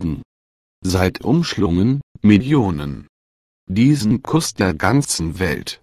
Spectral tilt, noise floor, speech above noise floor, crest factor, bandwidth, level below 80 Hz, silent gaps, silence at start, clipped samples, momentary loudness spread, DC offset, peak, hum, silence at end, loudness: -5.5 dB/octave; under -90 dBFS; over 73 dB; 18 dB; 15 kHz; -36 dBFS; 0.25-0.82 s, 2.03-2.15 s, 3.09-3.67 s; 0 s; under 0.1%; 12 LU; under 0.1%; 0 dBFS; none; 0.1 s; -18 LUFS